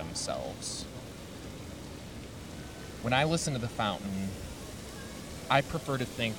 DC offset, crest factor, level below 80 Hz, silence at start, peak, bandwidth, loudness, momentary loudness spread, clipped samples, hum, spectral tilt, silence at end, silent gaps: under 0.1%; 26 dB; -52 dBFS; 0 s; -10 dBFS; 19 kHz; -34 LUFS; 15 LU; under 0.1%; none; -4 dB/octave; 0 s; none